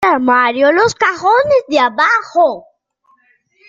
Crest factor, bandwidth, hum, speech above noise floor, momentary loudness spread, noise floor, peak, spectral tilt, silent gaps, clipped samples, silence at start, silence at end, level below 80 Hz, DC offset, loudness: 12 dB; 7.8 kHz; none; 45 dB; 3 LU; -57 dBFS; -2 dBFS; -4 dB/octave; none; under 0.1%; 0 s; 1.1 s; -56 dBFS; under 0.1%; -12 LUFS